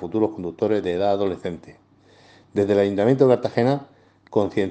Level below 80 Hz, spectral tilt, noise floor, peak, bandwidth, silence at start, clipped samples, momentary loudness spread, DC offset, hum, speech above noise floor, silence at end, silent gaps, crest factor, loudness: -64 dBFS; -8 dB/octave; -53 dBFS; -4 dBFS; 8.8 kHz; 0 s; under 0.1%; 11 LU; under 0.1%; none; 32 dB; 0 s; none; 18 dB; -21 LUFS